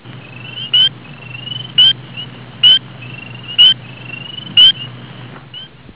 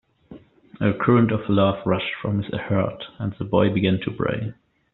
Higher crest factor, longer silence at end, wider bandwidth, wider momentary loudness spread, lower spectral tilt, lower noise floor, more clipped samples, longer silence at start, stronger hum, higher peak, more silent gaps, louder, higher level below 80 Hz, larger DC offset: about the same, 16 dB vs 18 dB; about the same, 0.3 s vs 0.4 s; about the same, 4 kHz vs 4.1 kHz; first, 24 LU vs 11 LU; first, -7.5 dB/octave vs -6 dB/octave; second, -34 dBFS vs -46 dBFS; neither; second, 0.15 s vs 0.3 s; neither; first, 0 dBFS vs -4 dBFS; neither; first, -9 LUFS vs -22 LUFS; about the same, -52 dBFS vs -52 dBFS; first, 0.4% vs under 0.1%